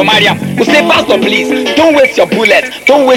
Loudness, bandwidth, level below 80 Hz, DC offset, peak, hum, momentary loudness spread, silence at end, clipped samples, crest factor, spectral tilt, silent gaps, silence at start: -8 LUFS; 17 kHz; -46 dBFS; under 0.1%; 0 dBFS; none; 4 LU; 0 s; 3%; 8 dB; -4 dB/octave; none; 0 s